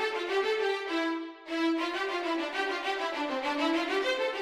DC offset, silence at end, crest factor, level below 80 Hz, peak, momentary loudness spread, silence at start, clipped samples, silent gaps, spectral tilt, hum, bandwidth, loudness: under 0.1%; 0 s; 14 dB; -74 dBFS; -16 dBFS; 3 LU; 0 s; under 0.1%; none; -2 dB/octave; none; 14 kHz; -30 LUFS